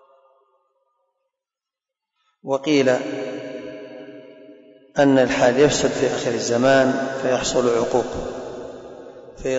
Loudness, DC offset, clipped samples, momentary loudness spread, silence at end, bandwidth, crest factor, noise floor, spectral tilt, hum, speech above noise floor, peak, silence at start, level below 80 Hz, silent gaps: -19 LUFS; under 0.1%; under 0.1%; 22 LU; 0 s; 8 kHz; 16 dB; -88 dBFS; -4.5 dB/octave; none; 70 dB; -6 dBFS; 2.45 s; -50 dBFS; none